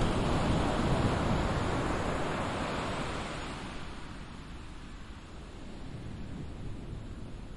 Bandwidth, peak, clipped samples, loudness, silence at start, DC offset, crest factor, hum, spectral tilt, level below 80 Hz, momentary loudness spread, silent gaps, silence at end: 11.5 kHz; -16 dBFS; under 0.1%; -34 LUFS; 0 s; under 0.1%; 18 dB; none; -6 dB/octave; -42 dBFS; 17 LU; none; 0 s